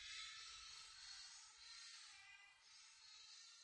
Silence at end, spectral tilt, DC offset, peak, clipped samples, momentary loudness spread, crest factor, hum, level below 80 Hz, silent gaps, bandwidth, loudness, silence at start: 0 s; 3.5 dB/octave; under 0.1%; -42 dBFS; under 0.1%; 10 LU; 18 dB; none; -86 dBFS; none; 10.5 kHz; -57 LUFS; 0 s